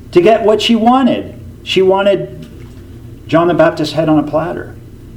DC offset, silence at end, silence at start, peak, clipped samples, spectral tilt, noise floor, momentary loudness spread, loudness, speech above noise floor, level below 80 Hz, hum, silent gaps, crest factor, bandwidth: under 0.1%; 0 s; 0 s; 0 dBFS; 0.1%; -6 dB/octave; -32 dBFS; 20 LU; -12 LUFS; 21 dB; -40 dBFS; none; none; 12 dB; 15.5 kHz